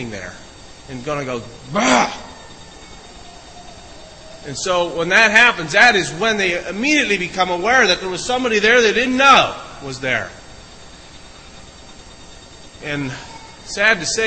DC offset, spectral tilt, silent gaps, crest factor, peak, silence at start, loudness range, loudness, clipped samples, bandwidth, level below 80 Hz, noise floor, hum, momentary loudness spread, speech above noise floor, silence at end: under 0.1%; -2.5 dB/octave; none; 18 dB; 0 dBFS; 0 s; 14 LU; -15 LUFS; under 0.1%; 11 kHz; -46 dBFS; -39 dBFS; none; 21 LU; 23 dB; 0 s